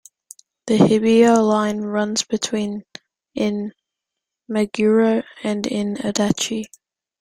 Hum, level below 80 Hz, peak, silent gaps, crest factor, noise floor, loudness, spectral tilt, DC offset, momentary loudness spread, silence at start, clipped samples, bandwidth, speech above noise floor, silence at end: none; -58 dBFS; -2 dBFS; none; 18 dB; -84 dBFS; -19 LUFS; -5 dB/octave; under 0.1%; 14 LU; 0.65 s; under 0.1%; 13.5 kHz; 65 dB; 0.55 s